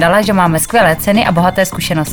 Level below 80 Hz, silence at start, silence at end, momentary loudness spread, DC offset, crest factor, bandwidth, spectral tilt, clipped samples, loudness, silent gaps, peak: -36 dBFS; 0 s; 0 s; 4 LU; under 0.1%; 12 dB; over 20 kHz; -4.5 dB/octave; under 0.1%; -11 LUFS; none; 0 dBFS